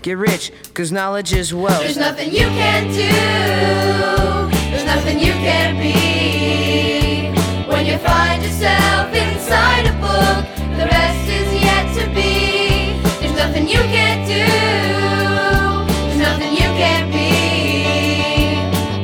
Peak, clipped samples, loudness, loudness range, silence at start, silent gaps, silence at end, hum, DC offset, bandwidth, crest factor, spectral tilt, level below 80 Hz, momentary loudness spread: 0 dBFS; under 0.1%; -15 LUFS; 1 LU; 0 s; none; 0 s; none; under 0.1%; over 20 kHz; 14 dB; -4.5 dB/octave; -26 dBFS; 4 LU